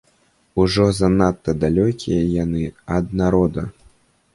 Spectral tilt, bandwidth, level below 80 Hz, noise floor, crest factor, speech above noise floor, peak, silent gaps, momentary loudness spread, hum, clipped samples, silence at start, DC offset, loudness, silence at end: -7 dB/octave; 11.5 kHz; -36 dBFS; -60 dBFS; 16 dB; 42 dB; -4 dBFS; none; 8 LU; none; under 0.1%; 0.55 s; under 0.1%; -19 LUFS; 0.65 s